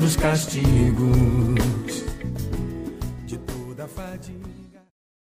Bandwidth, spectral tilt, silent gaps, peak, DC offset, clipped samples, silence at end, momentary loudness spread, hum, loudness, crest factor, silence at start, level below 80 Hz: 15.5 kHz; -6 dB/octave; none; -8 dBFS; under 0.1%; under 0.1%; 0.65 s; 17 LU; none; -23 LUFS; 14 dB; 0 s; -32 dBFS